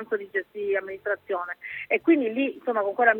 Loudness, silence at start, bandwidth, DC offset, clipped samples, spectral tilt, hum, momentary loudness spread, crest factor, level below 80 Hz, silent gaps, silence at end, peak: -26 LUFS; 0 s; 4 kHz; under 0.1%; under 0.1%; -7 dB/octave; none; 9 LU; 20 dB; -74 dBFS; none; 0 s; -6 dBFS